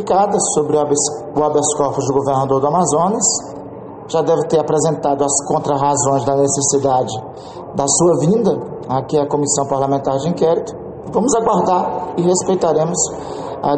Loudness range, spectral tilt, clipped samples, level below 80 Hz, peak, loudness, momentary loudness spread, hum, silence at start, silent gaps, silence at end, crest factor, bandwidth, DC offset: 1 LU; -5 dB/octave; under 0.1%; -50 dBFS; -2 dBFS; -16 LUFS; 9 LU; none; 0 s; none; 0 s; 14 dB; 9 kHz; under 0.1%